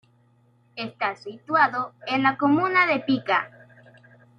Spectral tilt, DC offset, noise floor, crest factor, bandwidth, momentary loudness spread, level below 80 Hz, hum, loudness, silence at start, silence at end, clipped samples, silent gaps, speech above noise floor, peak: -6.5 dB/octave; under 0.1%; -61 dBFS; 20 dB; 6.8 kHz; 15 LU; -72 dBFS; none; -22 LUFS; 0.75 s; 0.9 s; under 0.1%; none; 38 dB; -6 dBFS